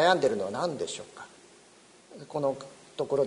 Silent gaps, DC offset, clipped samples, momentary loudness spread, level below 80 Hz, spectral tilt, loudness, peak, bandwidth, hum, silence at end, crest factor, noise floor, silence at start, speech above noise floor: none; under 0.1%; under 0.1%; 22 LU; -72 dBFS; -4 dB/octave; -31 LUFS; -8 dBFS; 10.5 kHz; none; 0 s; 22 dB; -57 dBFS; 0 s; 28 dB